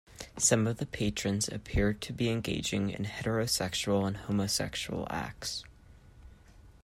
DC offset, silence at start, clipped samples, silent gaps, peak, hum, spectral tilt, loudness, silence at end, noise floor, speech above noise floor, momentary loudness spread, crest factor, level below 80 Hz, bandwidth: under 0.1%; 0.1 s; under 0.1%; none; -12 dBFS; none; -4 dB/octave; -31 LUFS; 0.15 s; -55 dBFS; 24 dB; 8 LU; 22 dB; -48 dBFS; 16 kHz